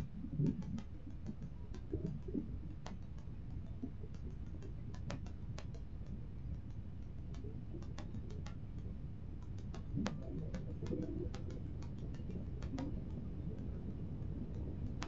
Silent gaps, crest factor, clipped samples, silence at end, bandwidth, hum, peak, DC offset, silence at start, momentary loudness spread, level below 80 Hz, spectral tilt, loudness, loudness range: none; 24 dB; under 0.1%; 0 s; 7.8 kHz; none; -22 dBFS; 0.3%; 0 s; 8 LU; -50 dBFS; -8 dB/octave; -46 LUFS; 4 LU